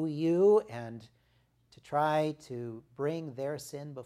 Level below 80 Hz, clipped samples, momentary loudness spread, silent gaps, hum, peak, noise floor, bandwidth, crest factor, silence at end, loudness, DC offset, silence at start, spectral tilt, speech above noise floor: -74 dBFS; under 0.1%; 17 LU; none; none; -16 dBFS; -70 dBFS; 14 kHz; 16 dB; 0 s; -31 LUFS; under 0.1%; 0 s; -7 dB/octave; 38 dB